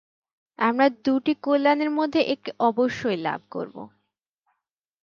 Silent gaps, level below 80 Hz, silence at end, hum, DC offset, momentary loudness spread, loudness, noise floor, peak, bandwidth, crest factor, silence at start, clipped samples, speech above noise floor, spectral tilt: none; -68 dBFS; 1.15 s; none; under 0.1%; 13 LU; -23 LUFS; -80 dBFS; -8 dBFS; 7.2 kHz; 18 dB; 0.6 s; under 0.1%; 57 dB; -6 dB/octave